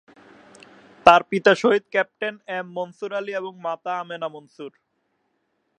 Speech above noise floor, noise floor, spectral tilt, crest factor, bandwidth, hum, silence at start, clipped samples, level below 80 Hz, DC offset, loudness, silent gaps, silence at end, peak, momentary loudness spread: 49 dB; -72 dBFS; -4.5 dB/octave; 24 dB; 10.5 kHz; none; 1.05 s; under 0.1%; -64 dBFS; under 0.1%; -22 LUFS; none; 1.1 s; 0 dBFS; 19 LU